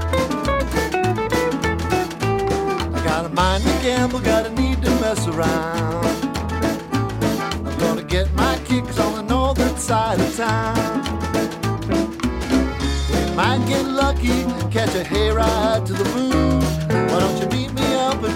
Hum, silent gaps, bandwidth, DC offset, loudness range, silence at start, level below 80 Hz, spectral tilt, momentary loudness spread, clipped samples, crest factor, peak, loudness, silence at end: none; none; 17 kHz; under 0.1%; 2 LU; 0 s; -28 dBFS; -5.5 dB/octave; 4 LU; under 0.1%; 16 dB; -4 dBFS; -20 LUFS; 0 s